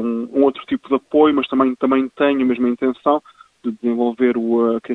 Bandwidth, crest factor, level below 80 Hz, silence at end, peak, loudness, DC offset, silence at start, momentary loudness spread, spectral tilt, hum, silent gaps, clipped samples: 4.1 kHz; 16 dB; -60 dBFS; 0 s; 0 dBFS; -18 LUFS; under 0.1%; 0 s; 7 LU; -7.5 dB/octave; none; none; under 0.1%